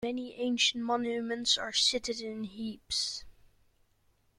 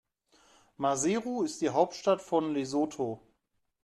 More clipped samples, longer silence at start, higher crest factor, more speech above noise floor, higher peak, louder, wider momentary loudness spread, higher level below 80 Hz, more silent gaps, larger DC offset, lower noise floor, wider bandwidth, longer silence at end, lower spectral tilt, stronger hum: neither; second, 0 s vs 0.8 s; about the same, 20 dB vs 20 dB; second, 38 dB vs 49 dB; about the same, -14 dBFS vs -12 dBFS; about the same, -30 LUFS vs -30 LUFS; first, 12 LU vs 7 LU; first, -64 dBFS vs -72 dBFS; neither; neither; second, -70 dBFS vs -79 dBFS; about the same, 13.5 kHz vs 12.5 kHz; first, 1.05 s vs 0.65 s; second, -1.5 dB/octave vs -4.5 dB/octave; neither